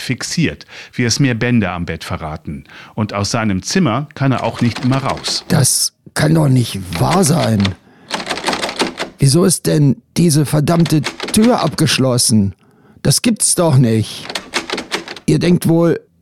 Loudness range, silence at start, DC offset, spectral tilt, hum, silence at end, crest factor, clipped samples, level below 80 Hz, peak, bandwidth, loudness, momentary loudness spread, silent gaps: 5 LU; 0 s; under 0.1%; -4.5 dB/octave; none; 0.25 s; 12 dB; under 0.1%; -42 dBFS; -2 dBFS; 16 kHz; -15 LUFS; 11 LU; none